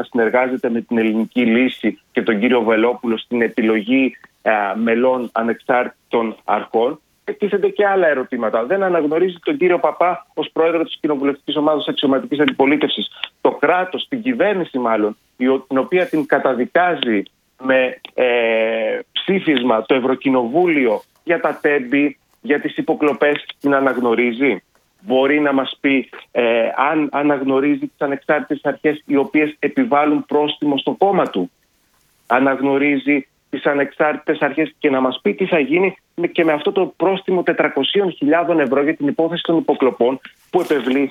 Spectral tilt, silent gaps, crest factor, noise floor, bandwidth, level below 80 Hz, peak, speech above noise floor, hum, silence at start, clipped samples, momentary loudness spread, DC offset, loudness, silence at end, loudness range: -7 dB/octave; none; 16 dB; -60 dBFS; 10.5 kHz; -66 dBFS; 0 dBFS; 43 dB; none; 0 s; under 0.1%; 6 LU; under 0.1%; -17 LUFS; 0 s; 1 LU